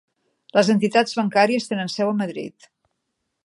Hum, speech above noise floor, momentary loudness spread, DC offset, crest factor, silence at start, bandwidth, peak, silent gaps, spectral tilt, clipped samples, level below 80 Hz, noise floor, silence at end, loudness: none; 57 dB; 10 LU; under 0.1%; 20 dB; 0.55 s; 11.5 kHz; -2 dBFS; none; -5 dB/octave; under 0.1%; -72 dBFS; -77 dBFS; 0.95 s; -20 LUFS